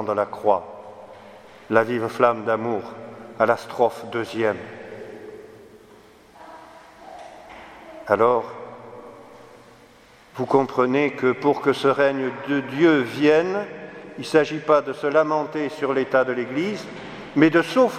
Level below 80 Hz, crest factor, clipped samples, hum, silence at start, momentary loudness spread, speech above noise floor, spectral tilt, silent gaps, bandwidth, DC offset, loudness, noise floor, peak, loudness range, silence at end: -66 dBFS; 22 dB; under 0.1%; none; 0 s; 23 LU; 30 dB; -6 dB/octave; none; 14 kHz; under 0.1%; -21 LUFS; -51 dBFS; 0 dBFS; 8 LU; 0 s